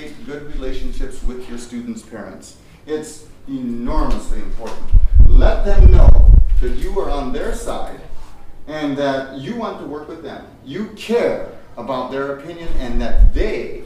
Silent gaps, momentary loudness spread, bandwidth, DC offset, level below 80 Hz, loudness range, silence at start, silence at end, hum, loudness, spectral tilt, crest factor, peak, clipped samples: none; 19 LU; 9.8 kHz; under 0.1%; -16 dBFS; 12 LU; 0 s; 0 s; none; -19 LUFS; -7 dB/octave; 14 dB; 0 dBFS; 0.6%